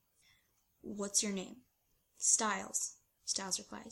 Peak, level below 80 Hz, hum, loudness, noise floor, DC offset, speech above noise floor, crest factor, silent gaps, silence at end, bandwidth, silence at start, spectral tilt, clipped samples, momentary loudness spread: -14 dBFS; -76 dBFS; none; -35 LUFS; -77 dBFS; under 0.1%; 40 dB; 24 dB; none; 0 s; 16.5 kHz; 0.85 s; -1 dB/octave; under 0.1%; 17 LU